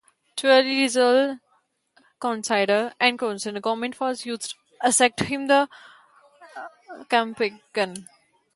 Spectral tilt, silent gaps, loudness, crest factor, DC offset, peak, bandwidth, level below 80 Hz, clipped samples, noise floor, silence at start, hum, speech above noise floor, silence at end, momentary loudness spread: -2.5 dB/octave; none; -22 LUFS; 20 dB; under 0.1%; -4 dBFS; 11.5 kHz; -66 dBFS; under 0.1%; -67 dBFS; 0.35 s; none; 45 dB; 0.55 s; 18 LU